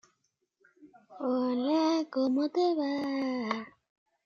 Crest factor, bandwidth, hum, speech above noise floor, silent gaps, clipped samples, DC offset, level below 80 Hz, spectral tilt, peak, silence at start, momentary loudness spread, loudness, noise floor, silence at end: 20 dB; 7.2 kHz; none; 49 dB; none; under 0.1%; under 0.1%; -82 dBFS; -5 dB/octave; -12 dBFS; 0.8 s; 8 LU; -30 LUFS; -79 dBFS; 0.55 s